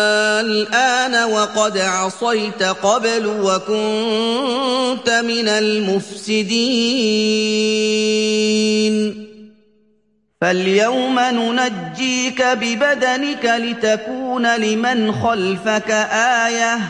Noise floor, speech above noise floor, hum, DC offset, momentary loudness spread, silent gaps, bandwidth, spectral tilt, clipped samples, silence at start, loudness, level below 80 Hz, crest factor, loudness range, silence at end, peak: -62 dBFS; 45 dB; none; 0.1%; 4 LU; none; 11 kHz; -3 dB/octave; under 0.1%; 0 s; -17 LUFS; -62 dBFS; 14 dB; 2 LU; 0 s; -2 dBFS